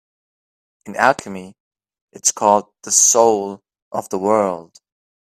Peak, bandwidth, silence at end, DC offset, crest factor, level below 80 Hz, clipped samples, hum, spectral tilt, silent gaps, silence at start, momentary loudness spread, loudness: 0 dBFS; 16 kHz; 0.7 s; under 0.1%; 20 dB; -66 dBFS; under 0.1%; none; -2 dB/octave; 1.60-1.71 s, 2.01-2.08 s, 3.82-3.91 s; 0.85 s; 19 LU; -16 LUFS